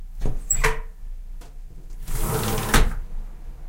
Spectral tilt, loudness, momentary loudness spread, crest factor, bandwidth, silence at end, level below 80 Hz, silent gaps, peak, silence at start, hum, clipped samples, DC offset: -3.5 dB/octave; -25 LUFS; 22 LU; 20 dB; 17 kHz; 0 s; -26 dBFS; none; -2 dBFS; 0 s; none; under 0.1%; under 0.1%